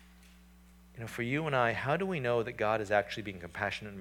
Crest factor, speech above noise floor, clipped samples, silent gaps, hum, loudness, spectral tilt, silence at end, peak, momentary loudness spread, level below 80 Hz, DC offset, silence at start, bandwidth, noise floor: 20 dB; 25 dB; under 0.1%; none; none; -33 LUFS; -6 dB/octave; 0 s; -14 dBFS; 11 LU; -60 dBFS; under 0.1%; 0 s; 18.5 kHz; -58 dBFS